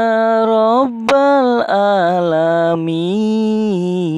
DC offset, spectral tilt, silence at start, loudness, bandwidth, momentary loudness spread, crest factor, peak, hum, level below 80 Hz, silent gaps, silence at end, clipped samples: under 0.1%; -7 dB/octave; 0 s; -14 LUFS; 10.5 kHz; 5 LU; 10 dB; -2 dBFS; none; -64 dBFS; none; 0 s; under 0.1%